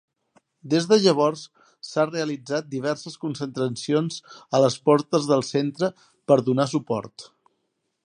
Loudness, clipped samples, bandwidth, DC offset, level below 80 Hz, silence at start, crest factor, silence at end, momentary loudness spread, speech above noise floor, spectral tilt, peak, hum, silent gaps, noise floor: -23 LUFS; under 0.1%; 11 kHz; under 0.1%; -70 dBFS; 0.65 s; 20 dB; 0.8 s; 12 LU; 53 dB; -5.5 dB/octave; -4 dBFS; none; none; -76 dBFS